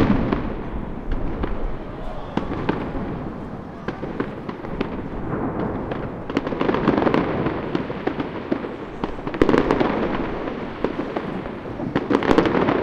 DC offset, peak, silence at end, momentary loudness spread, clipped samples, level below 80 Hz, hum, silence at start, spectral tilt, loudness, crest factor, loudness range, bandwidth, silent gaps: under 0.1%; 0 dBFS; 0 s; 13 LU; under 0.1%; -34 dBFS; none; 0 s; -8 dB/octave; -24 LUFS; 24 dB; 6 LU; 9.2 kHz; none